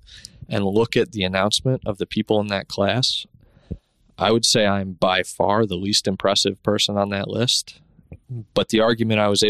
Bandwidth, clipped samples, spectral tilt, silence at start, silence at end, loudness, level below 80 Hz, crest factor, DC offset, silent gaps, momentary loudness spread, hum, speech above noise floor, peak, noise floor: 14 kHz; under 0.1%; -4 dB/octave; 0.1 s; 0 s; -20 LUFS; -50 dBFS; 18 dB; under 0.1%; none; 14 LU; none; 21 dB; -4 dBFS; -42 dBFS